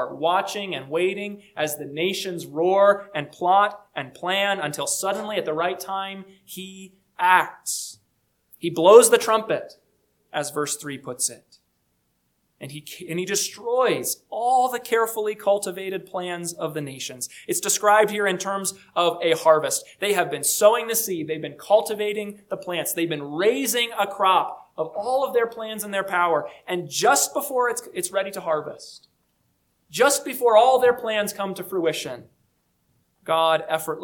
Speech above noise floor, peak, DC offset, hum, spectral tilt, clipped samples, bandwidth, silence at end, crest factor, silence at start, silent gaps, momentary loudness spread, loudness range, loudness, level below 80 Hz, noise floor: 48 dB; 0 dBFS; under 0.1%; none; -2.5 dB/octave; under 0.1%; 19 kHz; 0 s; 24 dB; 0 s; none; 14 LU; 6 LU; -22 LUFS; -72 dBFS; -70 dBFS